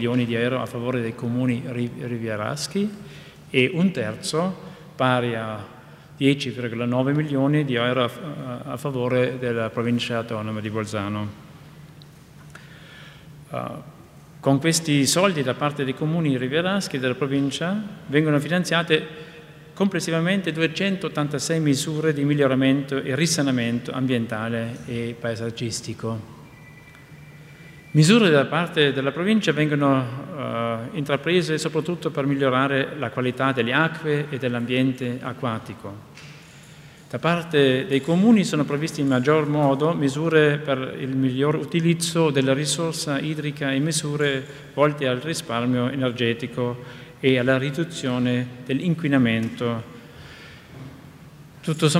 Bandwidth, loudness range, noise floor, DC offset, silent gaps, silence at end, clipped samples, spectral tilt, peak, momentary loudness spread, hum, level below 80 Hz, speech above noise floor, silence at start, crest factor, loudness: 15.5 kHz; 7 LU; -46 dBFS; under 0.1%; none; 0 s; under 0.1%; -5.5 dB/octave; -4 dBFS; 13 LU; none; -60 dBFS; 24 dB; 0 s; 20 dB; -23 LUFS